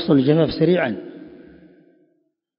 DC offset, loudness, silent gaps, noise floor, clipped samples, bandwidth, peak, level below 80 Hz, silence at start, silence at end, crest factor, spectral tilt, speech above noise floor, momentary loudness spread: under 0.1%; -18 LUFS; none; -68 dBFS; under 0.1%; 5.4 kHz; -2 dBFS; -52 dBFS; 0 s; 1.3 s; 18 dB; -12 dB/octave; 51 dB; 22 LU